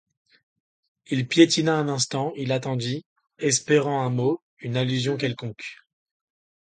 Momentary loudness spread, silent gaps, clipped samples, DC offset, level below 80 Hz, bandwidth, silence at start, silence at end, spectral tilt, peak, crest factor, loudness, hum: 14 LU; 3.06-3.16 s, 4.42-4.57 s; under 0.1%; under 0.1%; -66 dBFS; 9.4 kHz; 1.1 s; 1 s; -4.5 dB/octave; -2 dBFS; 22 dB; -24 LUFS; none